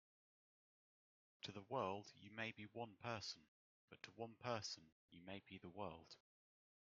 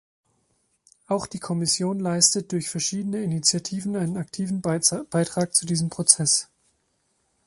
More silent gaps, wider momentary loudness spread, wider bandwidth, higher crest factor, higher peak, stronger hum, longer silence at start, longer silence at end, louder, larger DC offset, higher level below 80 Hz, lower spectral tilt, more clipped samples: first, 3.48-3.88 s, 4.92-5.08 s vs none; first, 15 LU vs 10 LU; second, 7.2 kHz vs 12 kHz; about the same, 24 dB vs 26 dB; second, -30 dBFS vs 0 dBFS; neither; first, 1.45 s vs 1.1 s; second, 0.75 s vs 1 s; second, -52 LUFS vs -23 LUFS; neither; second, -88 dBFS vs -62 dBFS; about the same, -3 dB/octave vs -3.5 dB/octave; neither